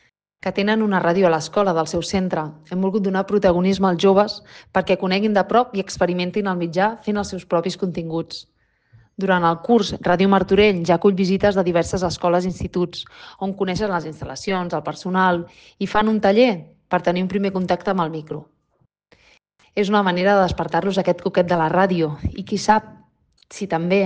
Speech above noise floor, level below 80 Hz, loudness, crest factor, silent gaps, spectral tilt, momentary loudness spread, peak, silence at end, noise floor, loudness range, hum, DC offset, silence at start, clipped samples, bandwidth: 46 dB; -46 dBFS; -20 LUFS; 16 dB; none; -6 dB/octave; 11 LU; -4 dBFS; 0 s; -66 dBFS; 5 LU; none; under 0.1%; 0.45 s; under 0.1%; 9.2 kHz